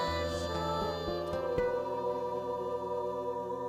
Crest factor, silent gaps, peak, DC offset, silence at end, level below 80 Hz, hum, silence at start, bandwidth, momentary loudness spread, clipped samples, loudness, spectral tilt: 14 dB; none; -20 dBFS; under 0.1%; 0 s; -54 dBFS; none; 0 s; 15 kHz; 3 LU; under 0.1%; -34 LUFS; -5.5 dB/octave